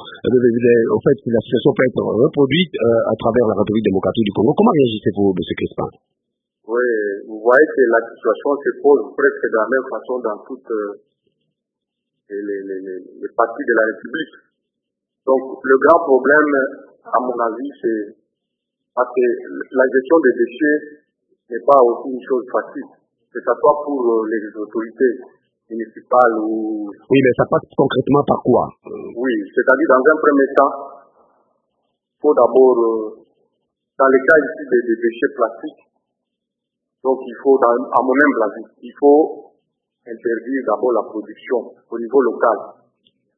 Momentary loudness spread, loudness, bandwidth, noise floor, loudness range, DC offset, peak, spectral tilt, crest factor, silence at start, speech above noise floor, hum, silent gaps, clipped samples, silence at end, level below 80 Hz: 14 LU; -17 LUFS; 3.9 kHz; -80 dBFS; 6 LU; under 0.1%; 0 dBFS; -9 dB/octave; 18 dB; 0 s; 64 dB; none; none; under 0.1%; 0.65 s; -56 dBFS